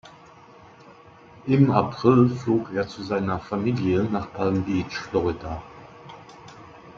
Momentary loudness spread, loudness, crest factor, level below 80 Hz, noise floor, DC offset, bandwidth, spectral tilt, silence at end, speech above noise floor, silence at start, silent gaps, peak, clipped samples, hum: 25 LU; -23 LUFS; 22 dB; -54 dBFS; -49 dBFS; under 0.1%; 7.4 kHz; -8 dB/octave; 0.05 s; 26 dB; 0.05 s; none; -2 dBFS; under 0.1%; none